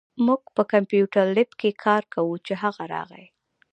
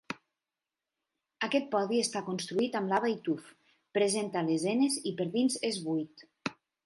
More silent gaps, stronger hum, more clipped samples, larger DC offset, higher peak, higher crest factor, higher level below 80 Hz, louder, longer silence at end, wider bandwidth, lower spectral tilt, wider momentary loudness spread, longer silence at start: neither; neither; neither; neither; first, -4 dBFS vs -14 dBFS; about the same, 20 dB vs 18 dB; first, -74 dBFS vs -80 dBFS; first, -23 LUFS vs -31 LUFS; first, 0.55 s vs 0.35 s; second, 8.6 kHz vs 12 kHz; first, -7.5 dB/octave vs -4 dB/octave; about the same, 11 LU vs 11 LU; about the same, 0.15 s vs 0.1 s